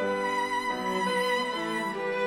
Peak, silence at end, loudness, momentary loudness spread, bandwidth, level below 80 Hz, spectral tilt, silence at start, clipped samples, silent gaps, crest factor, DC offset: -16 dBFS; 0 s; -28 LUFS; 4 LU; 18 kHz; -66 dBFS; -4 dB/octave; 0 s; under 0.1%; none; 12 dB; under 0.1%